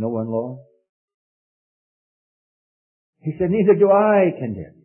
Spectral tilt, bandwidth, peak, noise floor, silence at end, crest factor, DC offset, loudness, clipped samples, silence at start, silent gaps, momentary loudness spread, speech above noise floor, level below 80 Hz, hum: -13 dB/octave; 3.1 kHz; -4 dBFS; under -90 dBFS; 0.2 s; 18 dB; under 0.1%; -18 LUFS; under 0.1%; 0 s; 0.89-1.08 s, 1.14-3.13 s; 17 LU; over 72 dB; -58 dBFS; none